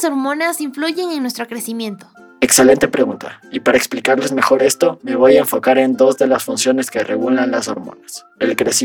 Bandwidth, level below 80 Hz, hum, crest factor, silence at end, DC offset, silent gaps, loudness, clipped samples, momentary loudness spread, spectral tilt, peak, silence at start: over 20 kHz; -54 dBFS; none; 14 dB; 0 s; under 0.1%; none; -15 LUFS; under 0.1%; 14 LU; -3 dB/octave; 0 dBFS; 0 s